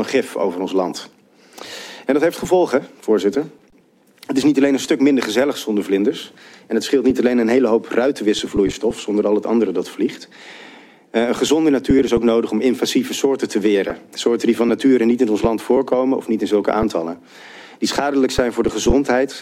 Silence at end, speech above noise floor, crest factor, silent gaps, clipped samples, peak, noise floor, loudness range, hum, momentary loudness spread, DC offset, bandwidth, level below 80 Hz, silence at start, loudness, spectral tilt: 0 s; 36 dB; 16 dB; none; under 0.1%; -2 dBFS; -54 dBFS; 3 LU; none; 10 LU; under 0.1%; 15.5 kHz; -40 dBFS; 0 s; -18 LUFS; -5 dB/octave